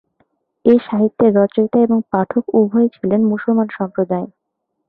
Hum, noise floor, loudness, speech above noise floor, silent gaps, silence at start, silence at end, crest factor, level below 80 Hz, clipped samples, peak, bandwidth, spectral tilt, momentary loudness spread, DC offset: none; -74 dBFS; -16 LUFS; 59 dB; none; 0.65 s; 0.6 s; 14 dB; -58 dBFS; under 0.1%; -2 dBFS; 4.2 kHz; -11.5 dB/octave; 7 LU; under 0.1%